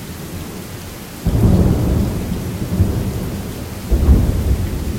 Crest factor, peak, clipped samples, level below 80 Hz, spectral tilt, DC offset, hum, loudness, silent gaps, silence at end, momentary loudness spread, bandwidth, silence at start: 16 dB; 0 dBFS; under 0.1%; -22 dBFS; -7 dB/octave; under 0.1%; none; -18 LUFS; none; 0 s; 15 LU; 16.5 kHz; 0 s